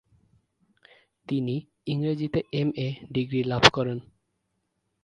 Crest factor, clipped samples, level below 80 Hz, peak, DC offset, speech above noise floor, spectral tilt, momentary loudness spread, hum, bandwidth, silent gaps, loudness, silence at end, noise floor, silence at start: 28 dB; under 0.1%; -58 dBFS; 0 dBFS; under 0.1%; 51 dB; -5 dB/octave; 13 LU; none; 10.5 kHz; none; -26 LUFS; 1 s; -77 dBFS; 1.3 s